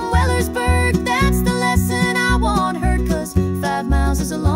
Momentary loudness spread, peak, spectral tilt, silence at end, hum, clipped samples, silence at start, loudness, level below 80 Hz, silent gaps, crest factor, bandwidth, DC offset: 3 LU; -4 dBFS; -5.5 dB/octave; 0 s; none; under 0.1%; 0 s; -18 LUFS; -24 dBFS; none; 12 dB; 16 kHz; under 0.1%